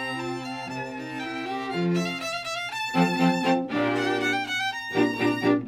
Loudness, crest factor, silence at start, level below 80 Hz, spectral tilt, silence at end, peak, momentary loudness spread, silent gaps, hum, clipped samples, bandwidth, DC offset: -26 LUFS; 18 dB; 0 s; -64 dBFS; -5 dB/octave; 0 s; -8 dBFS; 10 LU; none; none; under 0.1%; 15.5 kHz; under 0.1%